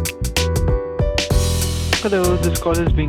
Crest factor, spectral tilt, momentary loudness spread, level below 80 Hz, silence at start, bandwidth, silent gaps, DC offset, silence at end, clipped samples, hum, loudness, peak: 14 dB; -4.5 dB/octave; 4 LU; -24 dBFS; 0 s; 18 kHz; none; under 0.1%; 0 s; under 0.1%; none; -19 LUFS; -4 dBFS